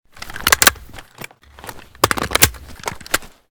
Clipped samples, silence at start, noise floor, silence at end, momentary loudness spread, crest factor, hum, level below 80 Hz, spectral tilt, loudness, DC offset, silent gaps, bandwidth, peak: 0.2%; 0.2 s; -39 dBFS; 0.25 s; 24 LU; 20 dB; none; -38 dBFS; -1.5 dB/octave; -16 LUFS; under 0.1%; none; over 20 kHz; 0 dBFS